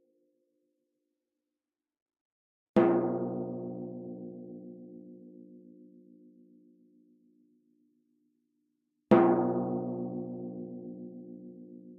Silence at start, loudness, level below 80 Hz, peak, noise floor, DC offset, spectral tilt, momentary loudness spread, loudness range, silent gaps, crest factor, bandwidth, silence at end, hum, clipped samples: 2.75 s; -30 LUFS; -74 dBFS; -10 dBFS; under -90 dBFS; under 0.1%; -8 dB/octave; 24 LU; 17 LU; none; 24 dB; 4.4 kHz; 0 s; none; under 0.1%